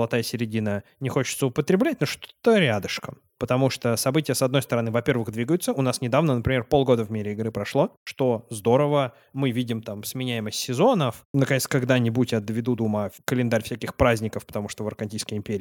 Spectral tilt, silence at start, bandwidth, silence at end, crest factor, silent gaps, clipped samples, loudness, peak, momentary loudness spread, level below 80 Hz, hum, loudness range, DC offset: -5.5 dB/octave; 0 s; 18 kHz; 0 s; 18 dB; 7.97-8.06 s, 11.25-11.34 s; under 0.1%; -24 LUFS; -6 dBFS; 9 LU; -50 dBFS; none; 2 LU; under 0.1%